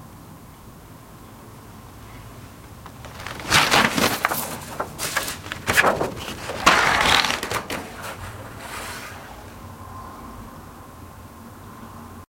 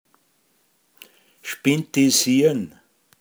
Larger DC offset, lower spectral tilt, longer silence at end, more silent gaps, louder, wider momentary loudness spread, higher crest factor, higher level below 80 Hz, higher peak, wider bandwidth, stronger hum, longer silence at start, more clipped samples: neither; about the same, -2.5 dB/octave vs -3.5 dB/octave; second, 0.1 s vs 0.5 s; neither; about the same, -21 LUFS vs -19 LUFS; first, 26 LU vs 19 LU; first, 26 dB vs 18 dB; first, -46 dBFS vs -72 dBFS; first, 0 dBFS vs -6 dBFS; second, 16.5 kHz vs over 20 kHz; neither; second, 0 s vs 1.45 s; neither